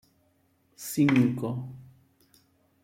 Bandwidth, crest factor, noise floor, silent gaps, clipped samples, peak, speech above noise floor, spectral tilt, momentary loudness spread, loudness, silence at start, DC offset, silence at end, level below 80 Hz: 16.5 kHz; 22 dB; -68 dBFS; none; under 0.1%; -8 dBFS; 43 dB; -6.5 dB/octave; 21 LU; -26 LUFS; 0.8 s; under 0.1%; 1 s; -68 dBFS